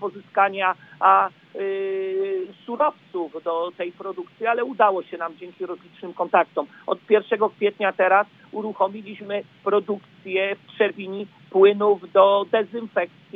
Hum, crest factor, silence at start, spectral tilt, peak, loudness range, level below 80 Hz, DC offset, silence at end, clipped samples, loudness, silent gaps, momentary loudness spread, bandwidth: none; 20 dB; 0 s; -7.5 dB/octave; -2 dBFS; 5 LU; -86 dBFS; under 0.1%; 0.3 s; under 0.1%; -22 LUFS; none; 15 LU; 4.3 kHz